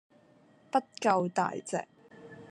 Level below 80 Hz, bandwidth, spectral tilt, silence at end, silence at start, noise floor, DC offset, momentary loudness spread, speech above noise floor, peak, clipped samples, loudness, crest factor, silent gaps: -80 dBFS; 11.5 kHz; -5 dB/octave; 0 s; 0.75 s; -62 dBFS; under 0.1%; 23 LU; 32 dB; -12 dBFS; under 0.1%; -31 LUFS; 22 dB; none